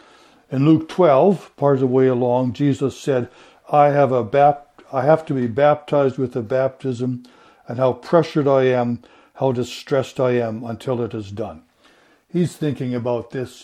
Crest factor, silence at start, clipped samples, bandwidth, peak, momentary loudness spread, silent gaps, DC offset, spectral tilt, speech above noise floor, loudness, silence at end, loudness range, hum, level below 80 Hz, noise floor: 18 dB; 0.5 s; under 0.1%; 14 kHz; 0 dBFS; 12 LU; none; under 0.1%; -7.5 dB/octave; 36 dB; -19 LUFS; 0.15 s; 6 LU; none; -60 dBFS; -54 dBFS